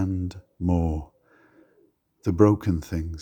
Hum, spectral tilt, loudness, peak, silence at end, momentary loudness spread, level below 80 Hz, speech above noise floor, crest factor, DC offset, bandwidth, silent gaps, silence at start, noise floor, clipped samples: none; -9 dB/octave; -25 LUFS; -2 dBFS; 0 s; 12 LU; -44 dBFS; 41 dB; 22 dB; under 0.1%; 15.5 kHz; none; 0 s; -64 dBFS; under 0.1%